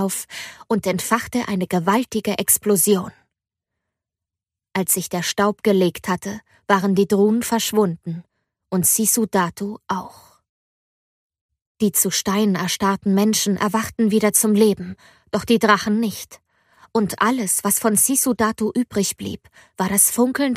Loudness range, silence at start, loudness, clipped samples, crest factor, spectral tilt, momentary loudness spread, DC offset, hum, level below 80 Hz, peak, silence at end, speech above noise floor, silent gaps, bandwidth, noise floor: 4 LU; 0 s; -19 LUFS; under 0.1%; 20 dB; -4 dB/octave; 12 LU; under 0.1%; none; -56 dBFS; 0 dBFS; 0 s; 68 dB; 10.49-11.30 s, 11.41-11.49 s, 11.66-11.75 s; 15.5 kHz; -88 dBFS